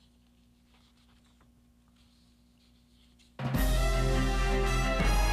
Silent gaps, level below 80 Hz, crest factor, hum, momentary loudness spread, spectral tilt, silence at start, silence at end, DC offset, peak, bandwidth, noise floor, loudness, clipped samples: none; -34 dBFS; 14 dB; 60 Hz at -65 dBFS; 6 LU; -5 dB/octave; 3.4 s; 0 s; under 0.1%; -16 dBFS; 15 kHz; -63 dBFS; -30 LUFS; under 0.1%